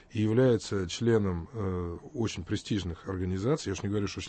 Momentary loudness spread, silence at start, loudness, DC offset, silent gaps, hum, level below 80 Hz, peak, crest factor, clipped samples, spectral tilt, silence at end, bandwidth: 10 LU; 0.1 s; -30 LUFS; under 0.1%; none; none; -52 dBFS; -14 dBFS; 16 dB; under 0.1%; -6.5 dB/octave; 0 s; 8.8 kHz